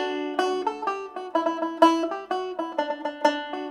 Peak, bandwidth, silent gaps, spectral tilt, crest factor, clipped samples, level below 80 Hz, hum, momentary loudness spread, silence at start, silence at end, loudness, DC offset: -4 dBFS; 12.5 kHz; none; -2.5 dB/octave; 22 dB; under 0.1%; -70 dBFS; none; 10 LU; 0 s; 0 s; -26 LUFS; under 0.1%